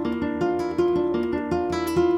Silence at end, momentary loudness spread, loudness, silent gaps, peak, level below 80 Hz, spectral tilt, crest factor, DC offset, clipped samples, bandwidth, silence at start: 0 s; 3 LU; -24 LUFS; none; -12 dBFS; -50 dBFS; -7 dB/octave; 12 dB; under 0.1%; under 0.1%; 13.5 kHz; 0 s